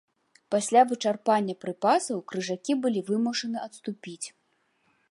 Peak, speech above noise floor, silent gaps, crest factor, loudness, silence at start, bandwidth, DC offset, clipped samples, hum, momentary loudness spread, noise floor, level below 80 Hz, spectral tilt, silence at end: -8 dBFS; 44 dB; none; 20 dB; -27 LUFS; 0.5 s; 11.5 kHz; under 0.1%; under 0.1%; none; 16 LU; -71 dBFS; -80 dBFS; -4 dB/octave; 0.8 s